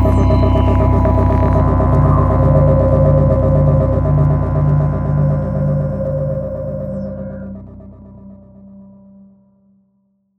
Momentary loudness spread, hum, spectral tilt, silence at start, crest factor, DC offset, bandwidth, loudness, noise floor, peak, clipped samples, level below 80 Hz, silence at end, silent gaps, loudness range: 12 LU; none; -11 dB/octave; 0 s; 14 dB; under 0.1%; 4.3 kHz; -14 LUFS; -61 dBFS; 0 dBFS; under 0.1%; -22 dBFS; 1.55 s; none; 16 LU